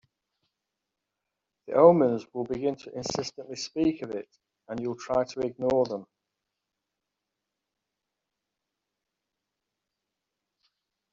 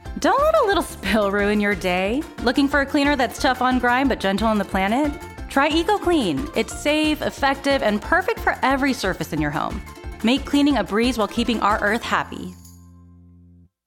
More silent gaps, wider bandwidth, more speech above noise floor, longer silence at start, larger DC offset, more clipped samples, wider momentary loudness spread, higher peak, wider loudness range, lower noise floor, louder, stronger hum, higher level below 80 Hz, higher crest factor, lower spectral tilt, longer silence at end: neither; second, 7.8 kHz vs 17 kHz; first, 59 dB vs 30 dB; first, 1.65 s vs 0.05 s; neither; neither; first, 17 LU vs 6 LU; about the same, -4 dBFS vs -4 dBFS; first, 8 LU vs 2 LU; first, -86 dBFS vs -51 dBFS; second, -27 LUFS vs -20 LUFS; neither; second, -64 dBFS vs -38 dBFS; first, 26 dB vs 16 dB; first, -6 dB/octave vs -4.5 dB/octave; first, 5.1 s vs 0.95 s